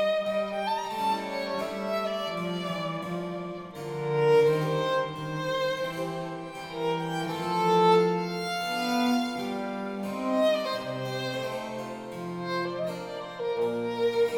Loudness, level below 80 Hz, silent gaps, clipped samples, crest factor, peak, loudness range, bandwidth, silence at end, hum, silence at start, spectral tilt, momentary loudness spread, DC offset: -29 LUFS; -66 dBFS; none; under 0.1%; 18 dB; -10 dBFS; 5 LU; 18.5 kHz; 0 s; none; 0 s; -5.5 dB/octave; 13 LU; under 0.1%